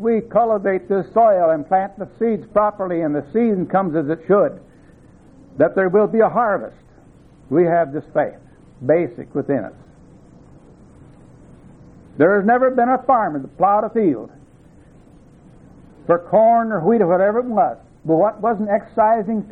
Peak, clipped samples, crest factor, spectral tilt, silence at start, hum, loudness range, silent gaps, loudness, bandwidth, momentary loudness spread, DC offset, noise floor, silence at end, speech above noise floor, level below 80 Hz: -2 dBFS; under 0.1%; 16 dB; -10.5 dB/octave; 0 s; none; 6 LU; none; -18 LUFS; 4.1 kHz; 9 LU; under 0.1%; -47 dBFS; 0 s; 30 dB; -54 dBFS